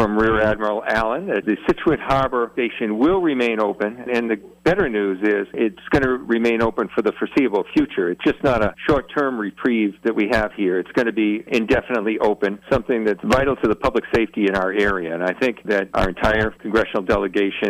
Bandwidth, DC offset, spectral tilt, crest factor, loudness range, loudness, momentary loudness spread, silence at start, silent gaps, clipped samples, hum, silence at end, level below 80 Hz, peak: 14.5 kHz; under 0.1%; -6.5 dB/octave; 12 dB; 1 LU; -20 LUFS; 4 LU; 0 s; none; under 0.1%; none; 0 s; -40 dBFS; -8 dBFS